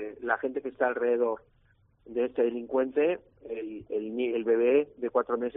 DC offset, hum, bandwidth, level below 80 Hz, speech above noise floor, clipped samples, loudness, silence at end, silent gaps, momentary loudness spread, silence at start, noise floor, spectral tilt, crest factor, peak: under 0.1%; none; 3.7 kHz; -68 dBFS; 33 dB; under 0.1%; -29 LUFS; 0.05 s; none; 12 LU; 0 s; -61 dBFS; -3.5 dB/octave; 18 dB; -10 dBFS